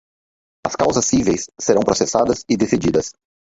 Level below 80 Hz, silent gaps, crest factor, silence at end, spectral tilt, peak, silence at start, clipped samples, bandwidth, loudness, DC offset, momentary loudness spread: -44 dBFS; none; 18 dB; 0.3 s; -4.5 dB/octave; -2 dBFS; 0.65 s; under 0.1%; 8 kHz; -18 LUFS; under 0.1%; 7 LU